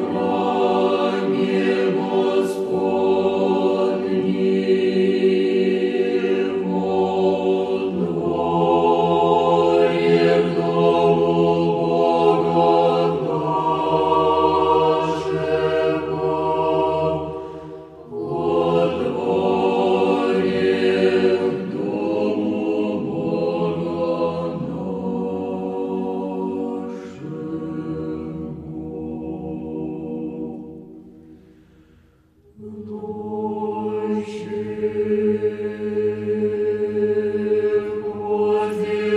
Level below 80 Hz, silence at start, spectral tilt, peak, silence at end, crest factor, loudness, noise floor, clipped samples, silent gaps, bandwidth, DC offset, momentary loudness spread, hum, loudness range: -56 dBFS; 0 s; -7.5 dB/octave; -4 dBFS; 0 s; 16 dB; -20 LUFS; -54 dBFS; under 0.1%; none; 10 kHz; under 0.1%; 12 LU; none; 12 LU